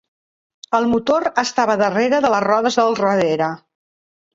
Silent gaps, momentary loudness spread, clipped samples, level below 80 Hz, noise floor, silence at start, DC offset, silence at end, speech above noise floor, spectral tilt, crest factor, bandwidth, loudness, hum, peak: none; 5 LU; under 0.1%; -56 dBFS; under -90 dBFS; 0.7 s; under 0.1%; 0.75 s; over 73 dB; -4.5 dB/octave; 18 dB; 7.8 kHz; -17 LUFS; none; -2 dBFS